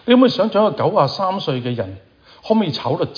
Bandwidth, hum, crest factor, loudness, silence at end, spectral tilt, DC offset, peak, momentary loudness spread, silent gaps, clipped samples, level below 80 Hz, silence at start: 5.2 kHz; none; 16 dB; -18 LUFS; 0.05 s; -7.5 dB/octave; under 0.1%; -2 dBFS; 10 LU; none; under 0.1%; -60 dBFS; 0.05 s